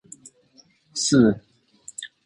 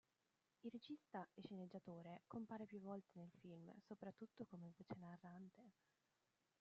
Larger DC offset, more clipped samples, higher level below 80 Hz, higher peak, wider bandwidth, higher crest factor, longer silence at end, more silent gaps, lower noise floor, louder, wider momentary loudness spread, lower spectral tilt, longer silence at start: neither; neither; first, -56 dBFS vs under -90 dBFS; first, -4 dBFS vs -40 dBFS; first, 11.5 kHz vs 7.4 kHz; about the same, 20 dB vs 18 dB; second, 0.2 s vs 0.9 s; neither; second, -58 dBFS vs -89 dBFS; first, -21 LUFS vs -58 LUFS; first, 19 LU vs 7 LU; second, -4.5 dB/octave vs -6.5 dB/octave; first, 0.95 s vs 0.65 s